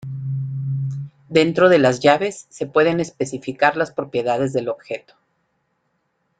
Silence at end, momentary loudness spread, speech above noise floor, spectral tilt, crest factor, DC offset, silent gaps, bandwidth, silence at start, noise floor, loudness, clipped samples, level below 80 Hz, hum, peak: 1.4 s; 14 LU; 51 dB; -6 dB/octave; 18 dB; under 0.1%; none; 9.4 kHz; 0 s; -70 dBFS; -19 LUFS; under 0.1%; -60 dBFS; none; -2 dBFS